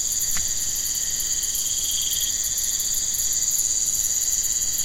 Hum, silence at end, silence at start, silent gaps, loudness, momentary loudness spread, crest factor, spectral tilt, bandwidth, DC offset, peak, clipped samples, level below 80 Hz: none; 0 s; 0 s; none; -21 LUFS; 3 LU; 16 dB; 1.5 dB/octave; 17 kHz; 0.6%; -8 dBFS; under 0.1%; -42 dBFS